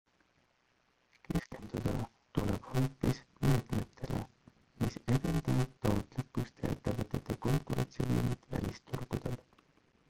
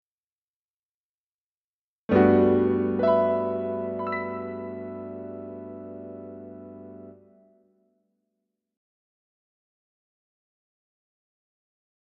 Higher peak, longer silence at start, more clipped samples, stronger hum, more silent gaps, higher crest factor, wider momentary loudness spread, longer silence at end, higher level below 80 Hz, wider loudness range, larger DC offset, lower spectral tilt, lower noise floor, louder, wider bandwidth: second, -16 dBFS vs -6 dBFS; second, 1.3 s vs 2.1 s; neither; neither; neither; about the same, 20 dB vs 24 dB; second, 8 LU vs 23 LU; second, 0.7 s vs 4.9 s; first, -50 dBFS vs -64 dBFS; second, 2 LU vs 20 LU; neither; about the same, -7 dB/octave vs -7.5 dB/octave; second, -74 dBFS vs under -90 dBFS; second, -36 LUFS vs -24 LUFS; first, 16.5 kHz vs 5 kHz